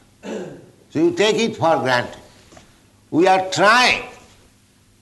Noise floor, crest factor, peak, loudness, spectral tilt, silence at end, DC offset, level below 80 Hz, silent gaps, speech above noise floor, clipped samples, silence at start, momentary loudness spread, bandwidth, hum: -55 dBFS; 16 dB; -4 dBFS; -17 LUFS; -4 dB/octave; 0.85 s; under 0.1%; -56 dBFS; none; 38 dB; under 0.1%; 0.25 s; 19 LU; 12 kHz; none